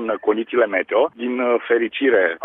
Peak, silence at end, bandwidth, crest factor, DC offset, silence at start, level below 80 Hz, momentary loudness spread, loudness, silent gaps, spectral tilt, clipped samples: -4 dBFS; 0 s; 3.9 kHz; 16 dB; under 0.1%; 0 s; -66 dBFS; 4 LU; -19 LUFS; none; -8 dB/octave; under 0.1%